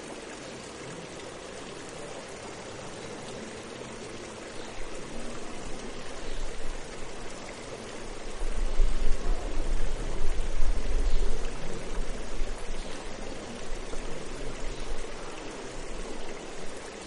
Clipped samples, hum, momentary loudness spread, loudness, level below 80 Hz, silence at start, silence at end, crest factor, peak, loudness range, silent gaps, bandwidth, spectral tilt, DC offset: under 0.1%; none; 7 LU; -38 LUFS; -32 dBFS; 0 s; 0 s; 18 dB; -8 dBFS; 5 LU; none; 10.5 kHz; -4 dB/octave; under 0.1%